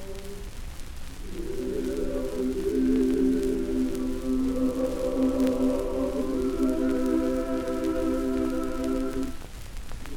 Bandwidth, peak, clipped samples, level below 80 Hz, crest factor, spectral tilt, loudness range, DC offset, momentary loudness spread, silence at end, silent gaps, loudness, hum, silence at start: 16.5 kHz; -12 dBFS; under 0.1%; -38 dBFS; 14 dB; -6.5 dB/octave; 2 LU; under 0.1%; 17 LU; 0 s; none; -27 LUFS; none; 0 s